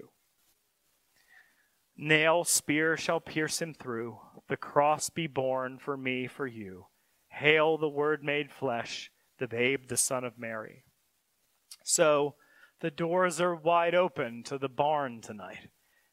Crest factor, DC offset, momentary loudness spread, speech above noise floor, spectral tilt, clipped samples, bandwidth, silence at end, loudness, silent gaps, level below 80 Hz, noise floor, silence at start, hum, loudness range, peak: 24 dB; under 0.1%; 16 LU; 45 dB; -3 dB/octave; under 0.1%; 16 kHz; 0.45 s; -29 LUFS; none; -76 dBFS; -75 dBFS; 2 s; none; 4 LU; -6 dBFS